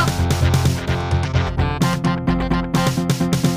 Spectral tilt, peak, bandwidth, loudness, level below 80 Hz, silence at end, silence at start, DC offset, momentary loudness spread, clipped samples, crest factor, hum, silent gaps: -6 dB/octave; -4 dBFS; 16 kHz; -19 LUFS; -30 dBFS; 0 s; 0 s; under 0.1%; 3 LU; under 0.1%; 14 dB; none; none